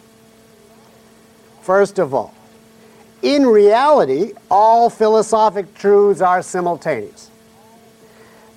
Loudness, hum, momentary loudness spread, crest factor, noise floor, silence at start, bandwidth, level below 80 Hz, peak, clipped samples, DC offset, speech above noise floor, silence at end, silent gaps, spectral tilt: -14 LUFS; none; 12 LU; 14 dB; -47 dBFS; 1.7 s; 12 kHz; -60 dBFS; -4 dBFS; under 0.1%; under 0.1%; 34 dB; 1.45 s; none; -5 dB/octave